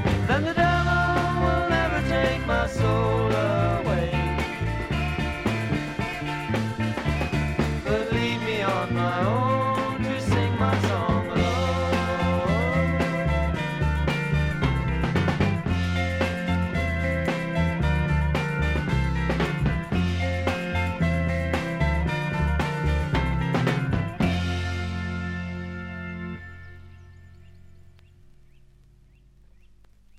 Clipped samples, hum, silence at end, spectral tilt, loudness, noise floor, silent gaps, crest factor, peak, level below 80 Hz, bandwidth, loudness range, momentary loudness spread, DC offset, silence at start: under 0.1%; none; 2.35 s; -6.5 dB/octave; -25 LUFS; -54 dBFS; none; 18 dB; -8 dBFS; -34 dBFS; 14 kHz; 5 LU; 5 LU; under 0.1%; 0 s